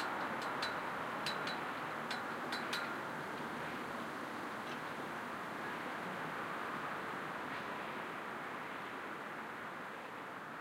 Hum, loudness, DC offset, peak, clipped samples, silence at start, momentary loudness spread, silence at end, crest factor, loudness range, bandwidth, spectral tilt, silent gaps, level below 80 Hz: none; -42 LUFS; under 0.1%; -24 dBFS; under 0.1%; 0 s; 6 LU; 0 s; 18 dB; 3 LU; 16 kHz; -4 dB/octave; none; -78 dBFS